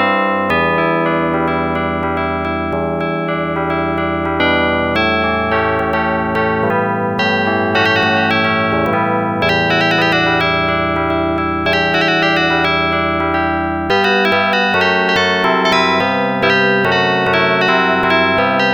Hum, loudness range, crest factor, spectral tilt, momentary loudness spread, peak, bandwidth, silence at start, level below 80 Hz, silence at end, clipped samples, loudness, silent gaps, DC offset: none; 4 LU; 12 dB; -5.5 dB/octave; 5 LU; -2 dBFS; over 20 kHz; 0 s; -38 dBFS; 0 s; under 0.1%; -14 LUFS; none; under 0.1%